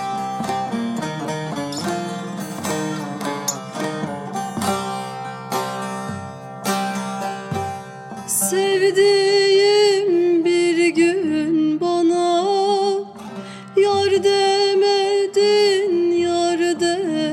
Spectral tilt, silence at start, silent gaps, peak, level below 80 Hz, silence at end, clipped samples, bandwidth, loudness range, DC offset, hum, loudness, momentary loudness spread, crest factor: -4 dB/octave; 0 s; none; -6 dBFS; -66 dBFS; 0 s; under 0.1%; 16.5 kHz; 9 LU; under 0.1%; none; -19 LUFS; 12 LU; 12 dB